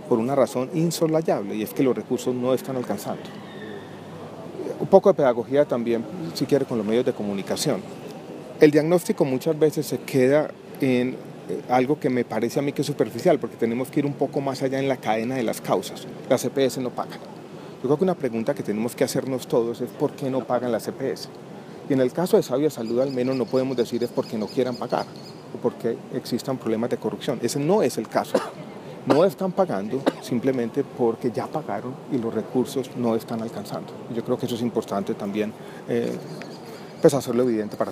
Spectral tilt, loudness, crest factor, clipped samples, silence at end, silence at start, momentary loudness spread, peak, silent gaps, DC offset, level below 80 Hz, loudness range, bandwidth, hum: -6 dB/octave; -24 LUFS; 24 dB; under 0.1%; 0 s; 0 s; 14 LU; 0 dBFS; none; under 0.1%; -70 dBFS; 5 LU; 15.5 kHz; none